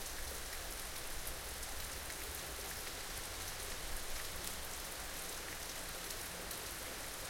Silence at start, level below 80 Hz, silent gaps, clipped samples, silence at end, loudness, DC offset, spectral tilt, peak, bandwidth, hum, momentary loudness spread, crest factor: 0 s; -52 dBFS; none; under 0.1%; 0 s; -43 LUFS; under 0.1%; -1.5 dB/octave; -18 dBFS; 17 kHz; none; 1 LU; 26 dB